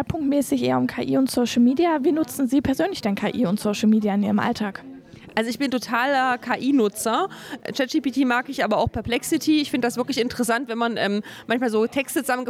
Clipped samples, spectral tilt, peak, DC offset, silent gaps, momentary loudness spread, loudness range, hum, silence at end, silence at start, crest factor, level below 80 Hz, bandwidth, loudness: under 0.1%; -4.5 dB/octave; -6 dBFS; under 0.1%; none; 6 LU; 2 LU; none; 0 s; 0 s; 16 dB; -50 dBFS; 16 kHz; -22 LUFS